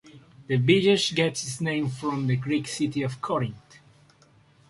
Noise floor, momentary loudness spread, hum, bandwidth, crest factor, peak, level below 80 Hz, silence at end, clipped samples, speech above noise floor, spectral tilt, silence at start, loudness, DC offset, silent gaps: -58 dBFS; 9 LU; none; 11.5 kHz; 20 dB; -6 dBFS; -62 dBFS; 1.1 s; under 0.1%; 33 dB; -5 dB/octave; 0.05 s; -25 LUFS; under 0.1%; none